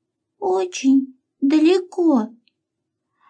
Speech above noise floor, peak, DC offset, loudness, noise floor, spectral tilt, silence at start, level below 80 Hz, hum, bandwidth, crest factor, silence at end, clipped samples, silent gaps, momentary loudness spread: 61 dB; -6 dBFS; under 0.1%; -19 LUFS; -79 dBFS; -4.5 dB/octave; 0.4 s; -84 dBFS; none; 9.2 kHz; 14 dB; 1 s; under 0.1%; none; 11 LU